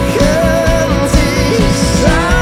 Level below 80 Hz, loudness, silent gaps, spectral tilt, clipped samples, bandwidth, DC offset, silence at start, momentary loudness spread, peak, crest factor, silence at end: -18 dBFS; -11 LUFS; none; -5 dB/octave; under 0.1%; 16 kHz; under 0.1%; 0 s; 1 LU; 0 dBFS; 10 dB; 0 s